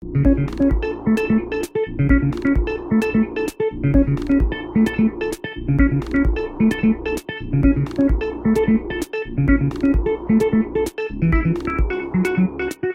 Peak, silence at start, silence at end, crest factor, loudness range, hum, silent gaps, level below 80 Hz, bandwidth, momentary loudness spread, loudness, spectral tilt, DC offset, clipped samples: -2 dBFS; 0 s; 0 s; 16 dB; 1 LU; none; none; -26 dBFS; 15.5 kHz; 6 LU; -20 LUFS; -8 dB/octave; under 0.1%; under 0.1%